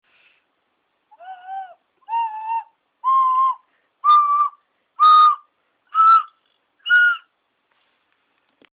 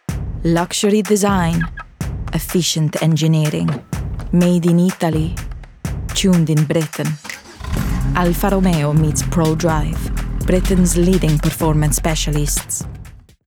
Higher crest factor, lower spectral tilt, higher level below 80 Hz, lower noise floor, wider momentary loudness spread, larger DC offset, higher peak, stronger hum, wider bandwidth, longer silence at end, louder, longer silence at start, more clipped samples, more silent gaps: about the same, 16 dB vs 14 dB; second, 1 dB/octave vs -5.5 dB/octave; second, -86 dBFS vs -26 dBFS; first, -70 dBFS vs -38 dBFS; first, 21 LU vs 11 LU; neither; about the same, -4 dBFS vs -4 dBFS; neither; second, 4.7 kHz vs 19 kHz; first, 1.6 s vs 0.25 s; about the same, -16 LUFS vs -17 LUFS; first, 1.25 s vs 0.1 s; neither; neither